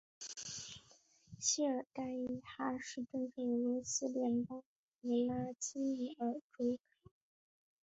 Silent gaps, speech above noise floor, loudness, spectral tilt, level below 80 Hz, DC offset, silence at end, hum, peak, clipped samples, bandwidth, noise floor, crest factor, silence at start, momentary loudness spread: 4.66-4.99 s, 6.42-6.50 s; 29 dB; -40 LUFS; -4.5 dB/octave; -76 dBFS; under 0.1%; 1.05 s; none; -20 dBFS; under 0.1%; 8 kHz; -68 dBFS; 20 dB; 0.2 s; 10 LU